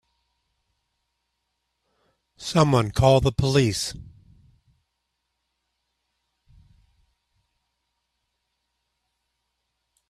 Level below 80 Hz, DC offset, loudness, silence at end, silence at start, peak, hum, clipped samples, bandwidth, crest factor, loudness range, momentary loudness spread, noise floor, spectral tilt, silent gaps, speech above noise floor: -48 dBFS; under 0.1%; -21 LUFS; 6.05 s; 2.4 s; -4 dBFS; none; under 0.1%; 14 kHz; 24 dB; 6 LU; 14 LU; -78 dBFS; -5.5 dB/octave; none; 58 dB